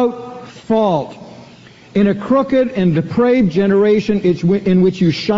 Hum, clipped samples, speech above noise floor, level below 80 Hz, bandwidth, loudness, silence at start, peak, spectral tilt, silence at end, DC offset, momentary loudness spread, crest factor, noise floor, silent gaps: none; under 0.1%; 27 dB; -46 dBFS; 7.6 kHz; -15 LUFS; 0 s; -2 dBFS; -6.5 dB/octave; 0 s; under 0.1%; 8 LU; 12 dB; -41 dBFS; none